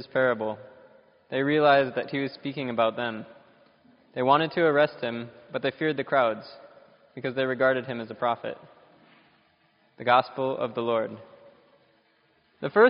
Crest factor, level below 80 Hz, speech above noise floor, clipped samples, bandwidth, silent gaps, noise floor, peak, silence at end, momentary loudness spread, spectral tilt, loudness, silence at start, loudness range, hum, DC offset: 22 dB; -74 dBFS; 40 dB; under 0.1%; 5.4 kHz; none; -66 dBFS; -6 dBFS; 0 s; 16 LU; -3.5 dB/octave; -26 LUFS; 0 s; 3 LU; none; under 0.1%